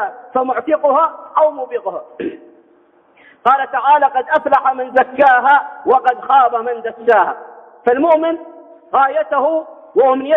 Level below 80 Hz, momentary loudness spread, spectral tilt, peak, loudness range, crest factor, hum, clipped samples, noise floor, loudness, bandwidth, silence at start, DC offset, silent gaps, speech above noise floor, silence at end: -64 dBFS; 11 LU; -6 dB/octave; -2 dBFS; 5 LU; 14 dB; none; under 0.1%; -51 dBFS; -14 LUFS; 4.1 kHz; 0 s; under 0.1%; none; 37 dB; 0 s